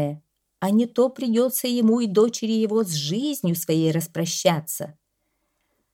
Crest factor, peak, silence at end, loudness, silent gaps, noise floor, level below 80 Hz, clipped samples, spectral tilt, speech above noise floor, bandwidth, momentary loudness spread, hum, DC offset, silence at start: 18 dB; -4 dBFS; 1.05 s; -22 LUFS; none; -74 dBFS; -70 dBFS; under 0.1%; -5 dB/octave; 52 dB; 17 kHz; 9 LU; none; under 0.1%; 0 s